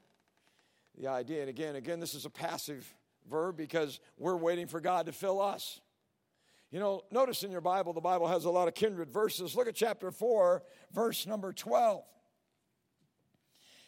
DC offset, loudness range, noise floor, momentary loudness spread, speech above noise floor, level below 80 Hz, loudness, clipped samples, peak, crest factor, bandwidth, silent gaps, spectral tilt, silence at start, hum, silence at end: under 0.1%; 6 LU; -80 dBFS; 11 LU; 46 dB; -86 dBFS; -34 LUFS; under 0.1%; -16 dBFS; 18 dB; 16.5 kHz; none; -4.5 dB/octave; 0.95 s; none; 1.85 s